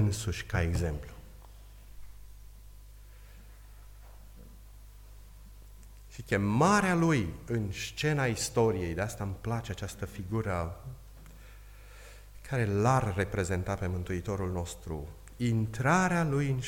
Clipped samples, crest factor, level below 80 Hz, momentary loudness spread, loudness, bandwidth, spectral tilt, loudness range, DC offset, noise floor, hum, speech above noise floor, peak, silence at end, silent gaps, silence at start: under 0.1%; 20 dB; -48 dBFS; 25 LU; -31 LUFS; 17 kHz; -6 dB/octave; 10 LU; under 0.1%; -50 dBFS; 50 Hz at -50 dBFS; 20 dB; -12 dBFS; 0 s; none; 0 s